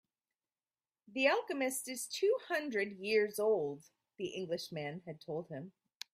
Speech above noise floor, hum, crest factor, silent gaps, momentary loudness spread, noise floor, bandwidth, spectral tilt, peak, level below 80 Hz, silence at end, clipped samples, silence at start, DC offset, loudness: over 54 dB; none; 22 dB; none; 16 LU; under -90 dBFS; 16 kHz; -3.5 dB/octave; -16 dBFS; -84 dBFS; 0.45 s; under 0.1%; 1.1 s; under 0.1%; -36 LUFS